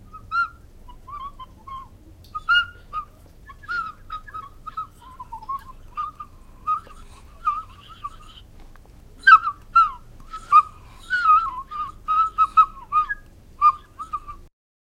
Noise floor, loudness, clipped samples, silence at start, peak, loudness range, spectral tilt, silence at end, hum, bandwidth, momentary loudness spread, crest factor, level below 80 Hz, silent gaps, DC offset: -46 dBFS; -20 LUFS; under 0.1%; 0.15 s; 0 dBFS; 14 LU; -2 dB/octave; 0.4 s; none; 11 kHz; 22 LU; 24 dB; -46 dBFS; none; under 0.1%